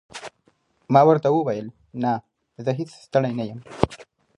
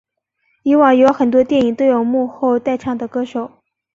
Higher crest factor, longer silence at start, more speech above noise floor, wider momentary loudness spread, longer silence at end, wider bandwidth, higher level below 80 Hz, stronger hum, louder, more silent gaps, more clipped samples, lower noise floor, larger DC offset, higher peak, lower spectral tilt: first, 22 dB vs 14 dB; second, 0.15 s vs 0.65 s; second, 44 dB vs 52 dB; first, 19 LU vs 12 LU; about the same, 0.35 s vs 0.45 s; first, 11 kHz vs 7.4 kHz; first, -50 dBFS vs -56 dBFS; neither; second, -22 LUFS vs -15 LUFS; neither; neither; about the same, -64 dBFS vs -66 dBFS; neither; about the same, 0 dBFS vs -2 dBFS; about the same, -7.5 dB/octave vs -6.5 dB/octave